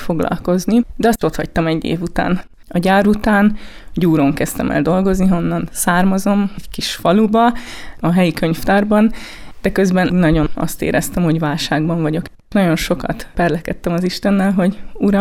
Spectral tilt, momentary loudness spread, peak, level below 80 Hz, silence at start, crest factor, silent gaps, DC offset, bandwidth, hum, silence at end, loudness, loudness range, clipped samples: -6 dB/octave; 8 LU; -4 dBFS; -32 dBFS; 0 s; 12 dB; none; under 0.1%; 16 kHz; none; 0 s; -16 LUFS; 2 LU; under 0.1%